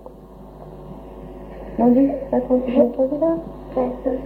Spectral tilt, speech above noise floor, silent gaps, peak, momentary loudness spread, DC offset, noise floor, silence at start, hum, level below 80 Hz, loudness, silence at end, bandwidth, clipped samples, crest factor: -10 dB/octave; 22 dB; none; -4 dBFS; 21 LU; under 0.1%; -40 dBFS; 0 s; none; -42 dBFS; -20 LUFS; 0 s; 4.3 kHz; under 0.1%; 18 dB